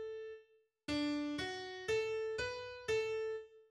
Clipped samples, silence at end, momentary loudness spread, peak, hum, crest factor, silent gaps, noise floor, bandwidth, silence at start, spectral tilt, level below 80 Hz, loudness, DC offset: under 0.1%; 0.05 s; 12 LU; -26 dBFS; none; 14 dB; none; -68 dBFS; 12.5 kHz; 0 s; -4 dB/octave; -66 dBFS; -40 LUFS; under 0.1%